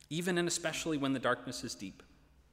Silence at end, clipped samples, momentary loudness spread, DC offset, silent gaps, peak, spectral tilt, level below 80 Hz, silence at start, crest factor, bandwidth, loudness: 0.5 s; under 0.1%; 11 LU; under 0.1%; none; -18 dBFS; -4 dB/octave; -66 dBFS; 0.1 s; 18 dB; 16 kHz; -35 LUFS